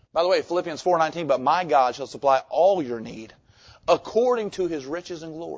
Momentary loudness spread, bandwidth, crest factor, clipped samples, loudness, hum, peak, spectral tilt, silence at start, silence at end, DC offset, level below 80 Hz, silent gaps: 13 LU; 8 kHz; 18 dB; under 0.1%; -23 LUFS; none; -6 dBFS; -5 dB/octave; 0.15 s; 0 s; under 0.1%; -62 dBFS; none